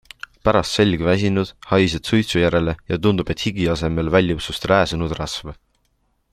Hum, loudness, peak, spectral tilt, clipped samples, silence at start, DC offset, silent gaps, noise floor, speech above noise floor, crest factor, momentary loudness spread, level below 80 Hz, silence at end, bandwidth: none; -19 LUFS; -2 dBFS; -6 dB/octave; under 0.1%; 0.45 s; under 0.1%; none; -66 dBFS; 47 dB; 18 dB; 7 LU; -40 dBFS; 0.8 s; 14 kHz